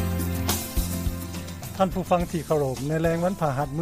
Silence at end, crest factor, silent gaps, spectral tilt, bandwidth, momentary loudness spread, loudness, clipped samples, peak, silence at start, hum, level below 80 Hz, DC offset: 0 s; 18 dB; none; -5.5 dB/octave; 15.5 kHz; 8 LU; -26 LUFS; under 0.1%; -8 dBFS; 0 s; none; -36 dBFS; under 0.1%